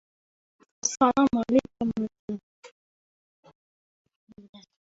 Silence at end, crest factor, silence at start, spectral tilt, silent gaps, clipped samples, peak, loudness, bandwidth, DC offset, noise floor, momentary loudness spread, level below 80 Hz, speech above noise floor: 0.3 s; 20 dB; 0.85 s; -4.5 dB/octave; 2.19-2.28 s, 2.43-2.63 s, 2.72-3.43 s, 3.55-4.05 s, 4.16-4.27 s, 4.49-4.53 s; under 0.1%; -8 dBFS; -26 LUFS; 8 kHz; under 0.1%; under -90 dBFS; 16 LU; -62 dBFS; over 66 dB